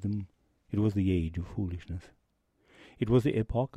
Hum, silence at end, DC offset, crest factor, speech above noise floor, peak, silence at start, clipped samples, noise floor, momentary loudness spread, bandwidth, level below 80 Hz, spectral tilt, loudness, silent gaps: none; 0 s; under 0.1%; 18 dB; 41 dB; -14 dBFS; 0 s; under 0.1%; -71 dBFS; 15 LU; 12 kHz; -48 dBFS; -9 dB/octave; -31 LUFS; none